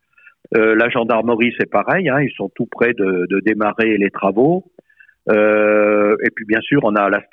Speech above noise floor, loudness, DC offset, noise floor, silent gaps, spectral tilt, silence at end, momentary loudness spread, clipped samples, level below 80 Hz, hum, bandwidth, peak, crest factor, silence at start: 33 dB; -16 LUFS; under 0.1%; -49 dBFS; none; -9 dB/octave; 0.1 s; 6 LU; under 0.1%; -58 dBFS; none; 4.9 kHz; -2 dBFS; 14 dB; 0.5 s